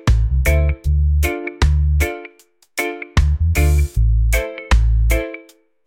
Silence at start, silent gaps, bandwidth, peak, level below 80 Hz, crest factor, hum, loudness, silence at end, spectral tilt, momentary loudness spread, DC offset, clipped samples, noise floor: 0.05 s; none; 17 kHz; -4 dBFS; -18 dBFS; 12 dB; none; -18 LUFS; 0.45 s; -5.5 dB/octave; 7 LU; under 0.1%; under 0.1%; -52 dBFS